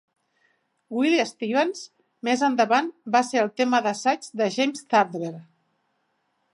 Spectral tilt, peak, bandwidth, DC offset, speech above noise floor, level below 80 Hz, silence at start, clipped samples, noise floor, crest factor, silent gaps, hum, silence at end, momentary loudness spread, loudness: -4 dB/octave; -6 dBFS; 11.5 kHz; under 0.1%; 49 dB; -82 dBFS; 0.9 s; under 0.1%; -72 dBFS; 18 dB; none; none; 1.1 s; 12 LU; -23 LUFS